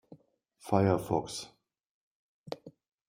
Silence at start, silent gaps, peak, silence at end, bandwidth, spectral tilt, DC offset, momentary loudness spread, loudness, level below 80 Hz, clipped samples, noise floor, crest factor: 0.1 s; 1.86-2.44 s; -10 dBFS; 0.4 s; 16 kHz; -6.5 dB/octave; under 0.1%; 20 LU; -31 LUFS; -66 dBFS; under 0.1%; -64 dBFS; 24 dB